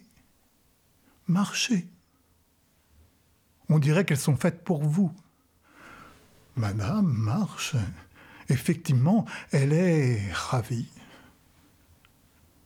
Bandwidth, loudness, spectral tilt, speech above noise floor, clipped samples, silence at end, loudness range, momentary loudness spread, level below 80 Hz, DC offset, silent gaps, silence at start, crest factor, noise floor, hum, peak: 16.5 kHz; -26 LUFS; -6 dB/octave; 41 dB; under 0.1%; 1.6 s; 5 LU; 16 LU; -58 dBFS; under 0.1%; none; 1.3 s; 16 dB; -66 dBFS; none; -12 dBFS